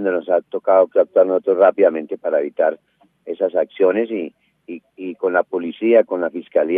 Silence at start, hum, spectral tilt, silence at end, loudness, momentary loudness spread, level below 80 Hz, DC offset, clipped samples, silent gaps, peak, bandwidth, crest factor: 0 s; none; -9 dB/octave; 0 s; -18 LUFS; 17 LU; -82 dBFS; under 0.1%; under 0.1%; none; -2 dBFS; 3.8 kHz; 16 dB